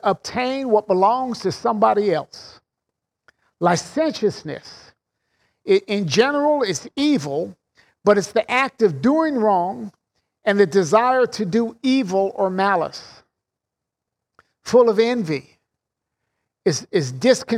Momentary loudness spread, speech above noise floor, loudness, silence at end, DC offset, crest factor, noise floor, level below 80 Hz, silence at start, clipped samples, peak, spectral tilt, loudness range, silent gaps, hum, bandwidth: 11 LU; 65 dB; -19 LUFS; 0 s; under 0.1%; 18 dB; -84 dBFS; -64 dBFS; 0.05 s; under 0.1%; -2 dBFS; -5 dB/octave; 4 LU; none; none; 13 kHz